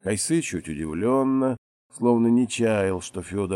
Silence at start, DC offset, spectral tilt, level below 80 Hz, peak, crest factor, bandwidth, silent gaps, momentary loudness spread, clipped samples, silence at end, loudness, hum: 0.05 s; under 0.1%; -5.5 dB/octave; -56 dBFS; -8 dBFS; 16 dB; 13.5 kHz; 1.58-1.90 s; 10 LU; under 0.1%; 0 s; -24 LUFS; none